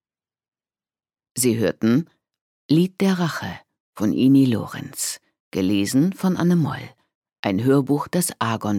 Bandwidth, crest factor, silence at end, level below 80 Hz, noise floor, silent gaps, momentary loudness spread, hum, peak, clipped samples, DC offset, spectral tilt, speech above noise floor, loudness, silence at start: 17 kHz; 16 dB; 0 s; -62 dBFS; under -90 dBFS; 2.41-2.69 s, 3.80-3.93 s, 5.40-5.51 s, 7.15-7.22 s, 7.39-7.43 s; 14 LU; none; -6 dBFS; under 0.1%; under 0.1%; -5.5 dB/octave; over 70 dB; -21 LUFS; 1.35 s